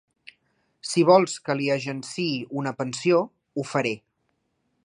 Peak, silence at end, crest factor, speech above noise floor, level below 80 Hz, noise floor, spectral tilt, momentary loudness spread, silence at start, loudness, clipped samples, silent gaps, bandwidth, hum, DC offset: -4 dBFS; 0.85 s; 20 dB; 50 dB; -74 dBFS; -74 dBFS; -5 dB/octave; 14 LU; 0.85 s; -24 LUFS; under 0.1%; none; 11.5 kHz; none; under 0.1%